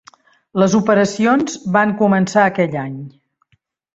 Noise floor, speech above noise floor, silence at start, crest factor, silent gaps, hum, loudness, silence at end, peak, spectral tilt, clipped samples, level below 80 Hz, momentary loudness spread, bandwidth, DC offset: -63 dBFS; 48 dB; 0.55 s; 16 dB; none; none; -16 LUFS; 0.85 s; -2 dBFS; -6 dB/octave; under 0.1%; -56 dBFS; 12 LU; 8 kHz; under 0.1%